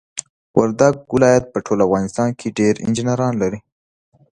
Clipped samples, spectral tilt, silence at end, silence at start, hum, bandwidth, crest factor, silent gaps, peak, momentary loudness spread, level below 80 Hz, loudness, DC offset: under 0.1%; -6 dB/octave; 0.75 s; 0.15 s; none; 11 kHz; 18 dB; 0.30-0.54 s; 0 dBFS; 8 LU; -50 dBFS; -17 LUFS; under 0.1%